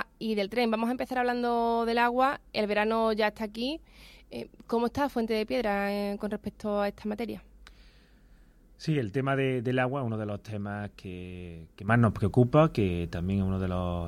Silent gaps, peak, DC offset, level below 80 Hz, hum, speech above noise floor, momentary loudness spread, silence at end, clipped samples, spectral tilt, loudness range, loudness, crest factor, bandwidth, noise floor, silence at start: none; -10 dBFS; under 0.1%; -52 dBFS; none; 29 dB; 15 LU; 0 s; under 0.1%; -7.5 dB/octave; 5 LU; -29 LUFS; 18 dB; 14.5 kHz; -57 dBFS; 0 s